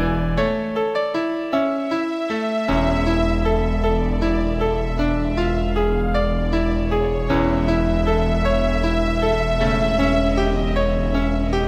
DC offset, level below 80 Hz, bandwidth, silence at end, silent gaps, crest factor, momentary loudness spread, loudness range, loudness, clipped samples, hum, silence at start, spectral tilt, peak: under 0.1%; -24 dBFS; 8.4 kHz; 0 s; none; 12 dB; 3 LU; 2 LU; -20 LUFS; under 0.1%; none; 0 s; -7 dB/octave; -6 dBFS